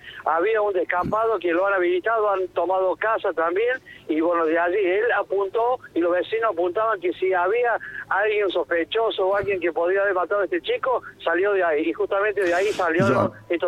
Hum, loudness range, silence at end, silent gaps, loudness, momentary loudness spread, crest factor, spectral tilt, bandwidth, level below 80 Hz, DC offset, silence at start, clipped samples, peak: none; 1 LU; 0 s; none; -22 LUFS; 4 LU; 16 dB; -6 dB/octave; 11.5 kHz; -58 dBFS; under 0.1%; 0.05 s; under 0.1%; -6 dBFS